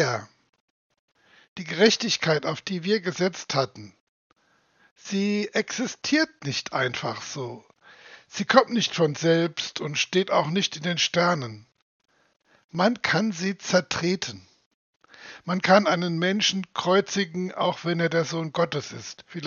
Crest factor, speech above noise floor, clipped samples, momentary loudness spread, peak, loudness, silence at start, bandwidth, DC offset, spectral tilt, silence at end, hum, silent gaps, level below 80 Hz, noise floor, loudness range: 24 dB; 39 dB; under 0.1%; 14 LU; -2 dBFS; -24 LUFS; 0 s; 7.4 kHz; under 0.1%; -4 dB/octave; 0 s; none; 0.60-0.90 s, 0.99-1.08 s, 1.48-1.56 s, 4.01-4.30 s, 4.91-4.96 s, 11.82-12.00 s, 12.64-12.69 s, 14.66-15.00 s; -72 dBFS; -63 dBFS; 5 LU